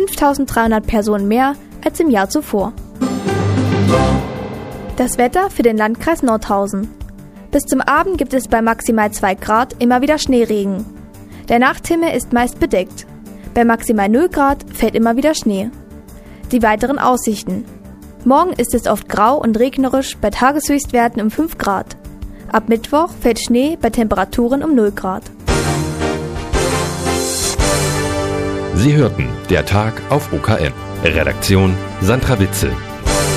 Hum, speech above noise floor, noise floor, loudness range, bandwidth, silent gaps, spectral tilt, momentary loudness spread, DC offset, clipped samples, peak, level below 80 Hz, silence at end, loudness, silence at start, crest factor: none; 21 dB; -35 dBFS; 2 LU; 15.5 kHz; none; -5 dB/octave; 9 LU; under 0.1%; under 0.1%; 0 dBFS; -30 dBFS; 0 s; -16 LUFS; 0 s; 16 dB